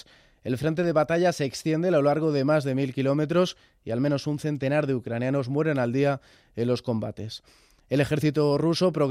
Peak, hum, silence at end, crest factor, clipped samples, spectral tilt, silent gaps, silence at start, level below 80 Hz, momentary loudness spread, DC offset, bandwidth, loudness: -10 dBFS; none; 0 s; 14 dB; under 0.1%; -7 dB/octave; none; 0.45 s; -60 dBFS; 10 LU; under 0.1%; 15 kHz; -25 LUFS